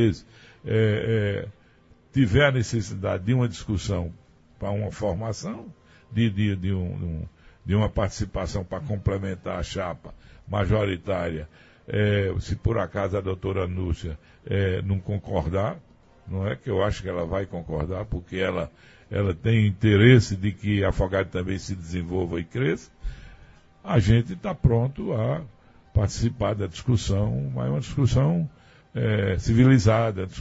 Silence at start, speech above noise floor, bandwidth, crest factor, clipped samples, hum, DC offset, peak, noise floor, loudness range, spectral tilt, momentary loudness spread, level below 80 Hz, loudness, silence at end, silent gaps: 0 s; 32 dB; 8 kHz; 22 dB; under 0.1%; none; under 0.1%; -2 dBFS; -56 dBFS; 7 LU; -7 dB/octave; 12 LU; -40 dBFS; -25 LUFS; 0 s; none